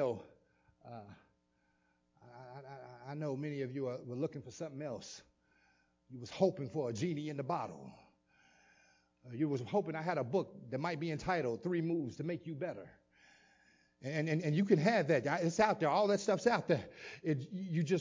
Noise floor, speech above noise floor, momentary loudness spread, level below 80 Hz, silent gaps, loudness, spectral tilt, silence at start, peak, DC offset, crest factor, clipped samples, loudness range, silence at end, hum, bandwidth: -77 dBFS; 41 dB; 20 LU; -72 dBFS; none; -36 LUFS; -6.5 dB/octave; 0 s; -16 dBFS; under 0.1%; 22 dB; under 0.1%; 11 LU; 0 s; none; 7.6 kHz